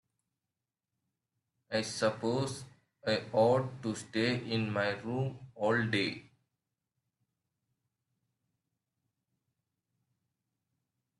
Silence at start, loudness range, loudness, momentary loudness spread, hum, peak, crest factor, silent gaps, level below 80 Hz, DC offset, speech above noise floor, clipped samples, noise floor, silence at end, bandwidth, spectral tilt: 1.7 s; 6 LU; -33 LUFS; 10 LU; none; -16 dBFS; 22 dB; none; -74 dBFS; under 0.1%; over 58 dB; under 0.1%; under -90 dBFS; 5 s; 12 kHz; -5.5 dB/octave